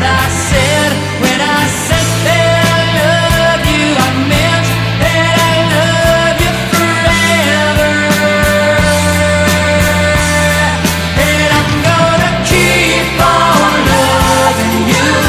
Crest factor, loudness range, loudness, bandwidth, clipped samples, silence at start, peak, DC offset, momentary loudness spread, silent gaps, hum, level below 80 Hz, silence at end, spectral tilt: 10 dB; 1 LU; -10 LUFS; 16 kHz; under 0.1%; 0 s; 0 dBFS; under 0.1%; 3 LU; none; none; -24 dBFS; 0 s; -4 dB/octave